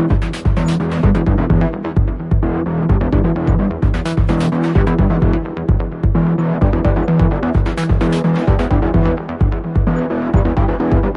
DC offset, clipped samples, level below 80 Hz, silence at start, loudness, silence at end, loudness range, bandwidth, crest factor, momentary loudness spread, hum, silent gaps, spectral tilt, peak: under 0.1%; under 0.1%; -20 dBFS; 0 s; -16 LUFS; 0 s; 1 LU; 10.5 kHz; 14 dB; 4 LU; none; none; -9 dB/octave; 0 dBFS